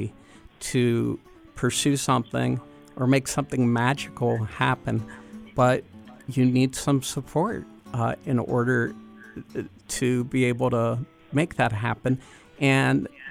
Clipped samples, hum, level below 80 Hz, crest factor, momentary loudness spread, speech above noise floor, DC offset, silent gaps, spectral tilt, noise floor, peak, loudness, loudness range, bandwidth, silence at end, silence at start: under 0.1%; none; -54 dBFS; 18 dB; 14 LU; 26 dB; under 0.1%; none; -5.5 dB/octave; -50 dBFS; -8 dBFS; -25 LUFS; 2 LU; 16 kHz; 0 s; 0 s